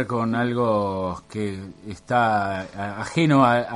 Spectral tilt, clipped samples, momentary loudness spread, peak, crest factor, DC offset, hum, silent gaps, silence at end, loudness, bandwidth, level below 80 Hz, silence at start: -6.5 dB/octave; under 0.1%; 14 LU; -4 dBFS; 18 dB; under 0.1%; none; none; 0 s; -23 LUFS; 11.5 kHz; -54 dBFS; 0 s